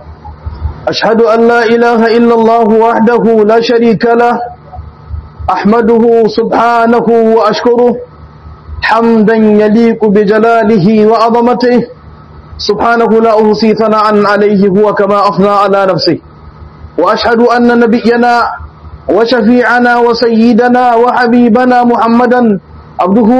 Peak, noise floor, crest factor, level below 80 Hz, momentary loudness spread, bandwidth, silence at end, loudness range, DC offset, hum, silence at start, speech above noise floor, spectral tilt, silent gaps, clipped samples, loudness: 0 dBFS; -32 dBFS; 8 dB; -36 dBFS; 10 LU; 8.2 kHz; 0 s; 2 LU; 0.3%; none; 0 s; 25 dB; -7 dB/octave; none; 3%; -7 LUFS